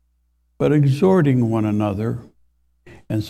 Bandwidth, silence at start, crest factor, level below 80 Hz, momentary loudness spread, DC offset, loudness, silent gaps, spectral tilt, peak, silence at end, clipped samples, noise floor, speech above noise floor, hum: 12.5 kHz; 0.6 s; 16 dB; -50 dBFS; 11 LU; under 0.1%; -18 LUFS; none; -9 dB/octave; -4 dBFS; 0 s; under 0.1%; -65 dBFS; 47 dB; none